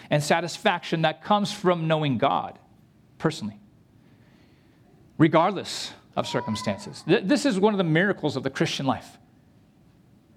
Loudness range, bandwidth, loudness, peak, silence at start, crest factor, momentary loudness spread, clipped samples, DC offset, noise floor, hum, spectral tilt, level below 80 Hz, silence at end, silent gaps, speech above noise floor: 4 LU; 14.5 kHz; -25 LUFS; -6 dBFS; 0 s; 20 dB; 11 LU; under 0.1%; under 0.1%; -57 dBFS; none; -5.5 dB/octave; -66 dBFS; 1.25 s; none; 33 dB